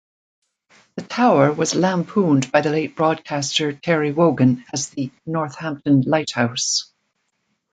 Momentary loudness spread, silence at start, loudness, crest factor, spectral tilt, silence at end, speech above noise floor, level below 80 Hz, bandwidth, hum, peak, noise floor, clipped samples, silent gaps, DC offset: 10 LU; 0.95 s; -19 LUFS; 18 dB; -5 dB/octave; 0.9 s; 53 dB; -62 dBFS; 9.4 kHz; none; -2 dBFS; -72 dBFS; under 0.1%; none; under 0.1%